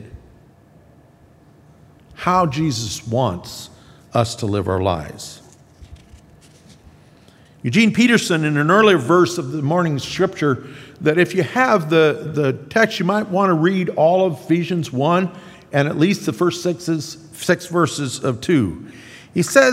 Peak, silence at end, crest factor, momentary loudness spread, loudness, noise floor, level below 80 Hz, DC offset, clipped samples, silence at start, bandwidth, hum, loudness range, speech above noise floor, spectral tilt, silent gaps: 0 dBFS; 0 s; 18 dB; 12 LU; -18 LUFS; -49 dBFS; -54 dBFS; under 0.1%; under 0.1%; 0 s; 16 kHz; none; 8 LU; 32 dB; -5.5 dB/octave; none